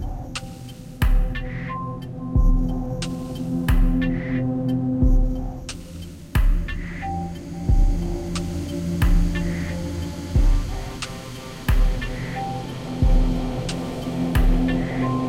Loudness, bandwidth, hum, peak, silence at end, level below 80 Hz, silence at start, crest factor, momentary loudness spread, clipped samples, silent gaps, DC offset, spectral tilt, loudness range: -25 LUFS; 16 kHz; none; -8 dBFS; 0 s; -24 dBFS; 0 s; 14 dB; 11 LU; under 0.1%; none; under 0.1%; -6.5 dB/octave; 3 LU